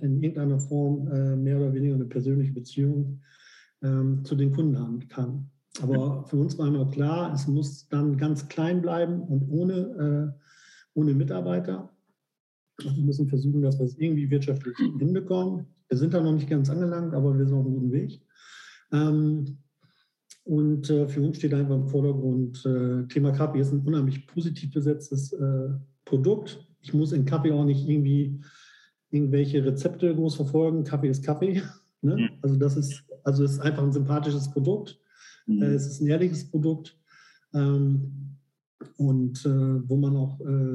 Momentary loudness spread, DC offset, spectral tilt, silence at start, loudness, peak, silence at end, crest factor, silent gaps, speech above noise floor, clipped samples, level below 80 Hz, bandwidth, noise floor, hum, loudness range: 8 LU; under 0.1%; -8.5 dB/octave; 0 s; -26 LUFS; -10 dBFS; 0 s; 14 dB; 12.40-12.67 s, 38.67-38.78 s; 42 dB; under 0.1%; -82 dBFS; 9.6 kHz; -67 dBFS; none; 2 LU